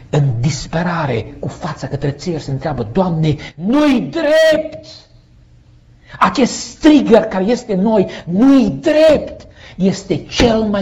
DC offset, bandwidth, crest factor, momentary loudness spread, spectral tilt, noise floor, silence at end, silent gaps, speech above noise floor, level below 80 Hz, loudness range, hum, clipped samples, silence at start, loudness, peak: under 0.1%; 11.5 kHz; 14 dB; 12 LU; -6 dB/octave; -45 dBFS; 0 s; none; 31 dB; -38 dBFS; 6 LU; none; under 0.1%; 0.15 s; -14 LUFS; 0 dBFS